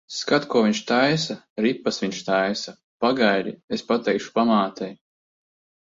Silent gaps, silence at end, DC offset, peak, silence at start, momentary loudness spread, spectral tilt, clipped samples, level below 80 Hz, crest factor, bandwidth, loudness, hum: 1.50-1.56 s, 2.83-3.00 s, 3.64-3.68 s; 0.9 s; under 0.1%; -6 dBFS; 0.1 s; 10 LU; -4.5 dB/octave; under 0.1%; -66 dBFS; 18 dB; 7.8 kHz; -22 LUFS; none